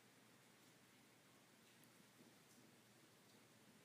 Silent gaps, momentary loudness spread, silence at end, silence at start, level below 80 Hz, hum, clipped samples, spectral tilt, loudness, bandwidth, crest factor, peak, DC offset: none; 1 LU; 0 s; 0 s; under -90 dBFS; none; under 0.1%; -3 dB/octave; -69 LUFS; 15.5 kHz; 20 dB; -50 dBFS; under 0.1%